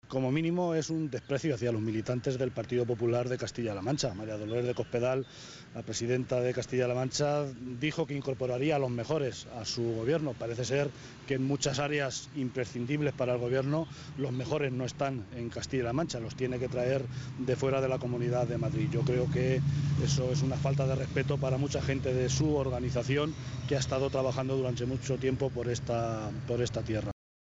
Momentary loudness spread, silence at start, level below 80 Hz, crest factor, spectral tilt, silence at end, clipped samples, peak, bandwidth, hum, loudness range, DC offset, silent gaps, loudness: 6 LU; 0.05 s; -52 dBFS; 16 dB; -6 dB/octave; 0.35 s; under 0.1%; -16 dBFS; 8 kHz; none; 3 LU; under 0.1%; none; -32 LUFS